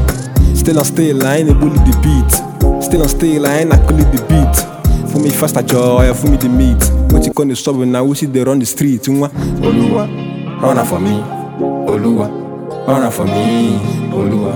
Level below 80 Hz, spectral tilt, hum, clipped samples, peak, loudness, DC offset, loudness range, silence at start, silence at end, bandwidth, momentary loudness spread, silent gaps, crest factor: -16 dBFS; -6 dB/octave; none; 0.2%; 0 dBFS; -13 LUFS; under 0.1%; 4 LU; 0 s; 0 s; over 20 kHz; 6 LU; none; 12 dB